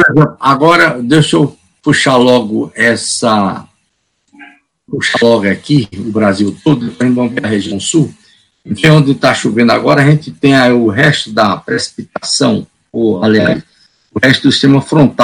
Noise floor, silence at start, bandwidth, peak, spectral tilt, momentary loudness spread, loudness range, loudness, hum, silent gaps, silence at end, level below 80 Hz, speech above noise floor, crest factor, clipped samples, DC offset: -62 dBFS; 0 s; 11.5 kHz; 0 dBFS; -5 dB/octave; 9 LU; 4 LU; -10 LUFS; none; none; 0 s; -48 dBFS; 52 dB; 10 dB; 1%; under 0.1%